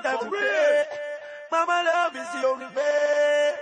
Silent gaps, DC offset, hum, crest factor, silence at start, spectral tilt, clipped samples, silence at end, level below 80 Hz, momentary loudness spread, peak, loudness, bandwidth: none; under 0.1%; none; 12 dB; 0 s; -1.5 dB/octave; under 0.1%; 0 s; -84 dBFS; 9 LU; -10 dBFS; -24 LUFS; 9.8 kHz